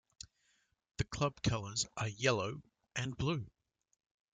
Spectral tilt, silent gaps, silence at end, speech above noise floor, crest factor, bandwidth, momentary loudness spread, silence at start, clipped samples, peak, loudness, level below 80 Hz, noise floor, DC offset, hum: -4.5 dB/octave; none; 0.85 s; 40 dB; 24 dB; 9.6 kHz; 20 LU; 1 s; under 0.1%; -16 dBFS; -37 LUFS; -58 dBFS; -77 dBFS; under 0.1%; none